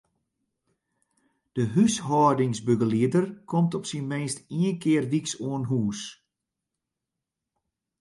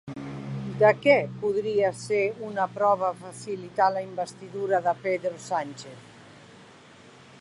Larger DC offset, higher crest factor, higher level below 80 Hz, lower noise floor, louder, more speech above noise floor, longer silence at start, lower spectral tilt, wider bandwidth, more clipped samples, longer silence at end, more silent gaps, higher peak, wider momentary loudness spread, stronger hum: neither; about the same, 18 dB vs 20 dB; about the same, -64 dBFS vs -66 dBFS; first, -86 dBFS vs -51 dBFS; about the same, -25 LUFS vs -26 LUFS; first, 61 dB vs 25 dB; first, 1.55 s vs 0.05 s; about the same, -6 dB/octave vs -5.5 dB/octave; about the same, 11.5 kHz vs 11.5 kHz; neither; first, 1.85 s vs 0.3 s; neither; about the same, -8 dBFS vs -6 dBFS; second, 9 LU vs 15 LU; neither